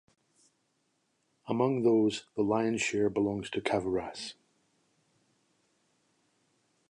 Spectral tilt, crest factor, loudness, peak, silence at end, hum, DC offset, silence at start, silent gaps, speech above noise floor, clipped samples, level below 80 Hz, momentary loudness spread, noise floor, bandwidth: -5.5 dB/octave; 22 dB; -30 LUFS; -12 dBFS; 2.55 s; none; under 0.1%; 1.45 s; none; 47 dB; under 0.1%; -66 dBFS; 10 LU; -76 dBFS; 11 kHz